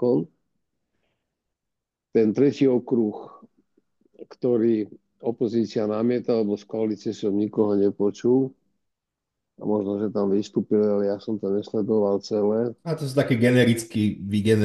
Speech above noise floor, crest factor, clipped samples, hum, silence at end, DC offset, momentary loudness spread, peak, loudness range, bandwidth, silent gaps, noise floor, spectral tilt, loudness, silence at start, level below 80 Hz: 61 dB; 18 dB; under 0.1%; none; 0 s; under 0.1%; 8 LU; -6 dBFS; 3 LU; 12.5 kHz; none; -84 dBFS; -7 dB/octave; -24 LUFS; 0 s; -68 dBFS